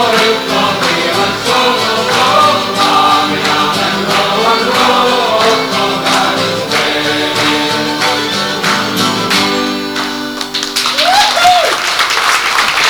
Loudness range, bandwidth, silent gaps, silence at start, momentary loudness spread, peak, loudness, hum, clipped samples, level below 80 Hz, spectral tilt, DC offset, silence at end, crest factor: 2 LU; over 20 kHz; none; 0 s; 5 LU; 0 dBFS; -11 LUFS; none; under 0.1%; -46 dBFS; -2.5 dB/octave; under 0.1%; 0 s; 12 dB